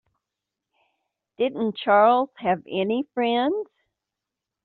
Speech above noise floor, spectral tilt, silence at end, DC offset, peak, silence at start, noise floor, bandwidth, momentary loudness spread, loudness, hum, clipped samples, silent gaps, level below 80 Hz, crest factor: 64 dB; -3 dB/octave; 1 s; under 0.1%; -6 dBFS; 1.4 s; -86 dBFS; 4.5 kHz; 10 LU; -23 LUFS; none; under 0.1%; none; -68 dBFS; 20 dB